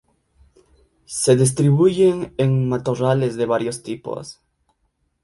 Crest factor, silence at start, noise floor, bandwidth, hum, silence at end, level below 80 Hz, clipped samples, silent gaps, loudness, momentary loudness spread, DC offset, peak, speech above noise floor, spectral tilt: 18 dB; 1.1 s; -69 dBFS; 11.5 kHz; none; 0.9 s; -54 dBFS; under 0.1%; none; -19 LUFS; 14 LU; under 0.1%; -2 dBFS; 51 dB; -6 dB/octave